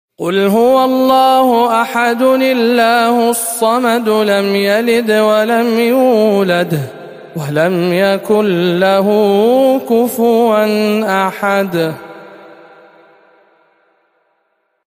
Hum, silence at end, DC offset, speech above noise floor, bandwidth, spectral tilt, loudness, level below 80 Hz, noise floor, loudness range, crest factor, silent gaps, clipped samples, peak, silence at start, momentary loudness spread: none; 2.5 s; under 0.1%; 52 dB; 15.5 kHz; -5 dB/octave; -12 LUFS; -60 dBFS; -64 dBFS; 6 LU; 12 dB; none; under 0.1%; 0 dBFS; 0.2 s; 5 LU